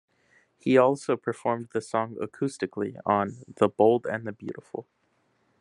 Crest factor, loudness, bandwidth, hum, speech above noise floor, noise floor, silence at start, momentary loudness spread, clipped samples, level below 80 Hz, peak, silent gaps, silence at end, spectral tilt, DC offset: 22 dB; -27 LUFS; 11 kHz; none; 43 dB; -70 dBFS; 0.65 s; 16 LU; under 0.1%; -74 dBFS; -6 dBFS; none; 0.8 s; -6.5 dB/octave; under 0.1%